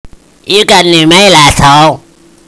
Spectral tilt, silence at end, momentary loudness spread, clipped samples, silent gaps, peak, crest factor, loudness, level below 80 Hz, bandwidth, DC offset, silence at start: -3.5 dB/octave; 0.5 s; 7 LU; 7%; none; 0 dBFS; 6 dB; -4 LUFS; -28 dBFS; 11 kHz; under 0.1%; 0.05 s